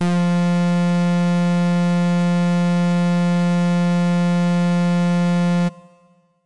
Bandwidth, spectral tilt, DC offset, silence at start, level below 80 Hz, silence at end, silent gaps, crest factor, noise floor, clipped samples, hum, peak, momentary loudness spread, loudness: 10.5 kHz; -7.5 dB/octave; 1%; 0 s; -66 dBFS; 0 s; none; 4 dB; -56 dBFS; under 0.1%; none; -14 dBFS; 0 LU; -18 LUFS